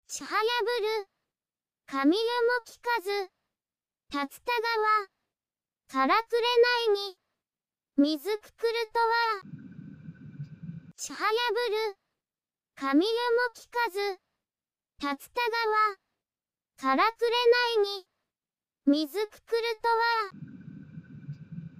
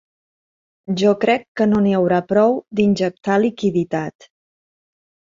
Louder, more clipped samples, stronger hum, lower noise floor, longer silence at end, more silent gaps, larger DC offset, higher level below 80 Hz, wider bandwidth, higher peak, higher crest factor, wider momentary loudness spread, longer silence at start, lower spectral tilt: second, -28 LUFS vs -18 LUFS; neither; neither; about the same, under -90 dBFS vs under -90 dBFS; second, 0 s vs 1.3 s; second, none vs 1.48-1.55 s; neither; second, -74 dBFS vs -56 dBFS; first, 15.5 kHz vs 7.6 kHz; second, -12 dBFS vs -2 dBFS; about the same, 18 dB vs 16 dB; first, 20 LU vs 7 LU; second, 0.1 s vs 0.9 s; second, -3.5 dB/octave vs -7 dB/octave